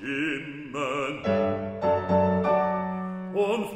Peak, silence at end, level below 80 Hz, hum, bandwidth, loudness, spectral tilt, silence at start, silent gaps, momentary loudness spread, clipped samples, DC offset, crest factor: -10 dBFS; 0 s; -60 dBFS; none; 14 kHz; -27 LUFS; -7 dB/octave; 0 s; none; 9 LU; under 0.1%; under 0.1%; 16 dB